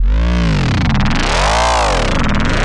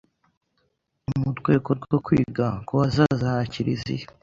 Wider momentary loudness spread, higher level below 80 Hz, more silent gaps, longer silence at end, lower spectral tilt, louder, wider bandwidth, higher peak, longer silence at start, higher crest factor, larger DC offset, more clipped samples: second, 3 LU vs 8 LU; first, -16 dBFS vs -48 dBFS; neither; second, 0 s vs 0.15 s; second, -5 dB/octave vs -8 dB/octave; first, -14 LUFS vs -24 LUFS; first, 11.5 kHz vs 7.6 kHz; first, 0 dBFS vs -4 dBFS; second, 0 s vs 1.1 s; second, 12 dB vs 20 dB; neither; neither